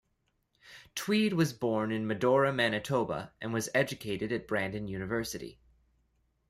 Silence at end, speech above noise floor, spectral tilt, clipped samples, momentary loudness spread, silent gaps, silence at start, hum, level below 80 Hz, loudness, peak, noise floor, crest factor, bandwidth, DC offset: 0.95 s; 46 dB; -5 dB/octave; under 0.1%; 11 LU; none; 0.65 s; none; -62 dBFS; -31 LUFS; -14 dBFS; -77 dBFS; 18 dB; 15.5 kHz; under 0.1%